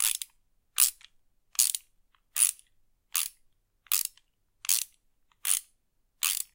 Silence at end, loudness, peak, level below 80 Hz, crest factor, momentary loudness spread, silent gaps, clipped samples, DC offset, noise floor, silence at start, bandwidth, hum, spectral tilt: 0.1 s; -28 LUFS; -4 dBFS; -72 dBFS; 30 dB; 12 LU; none; under 0.1%; under 0.1%; -72 dBFS; 0 s; 17.5 kHz; none; 6 dB/octave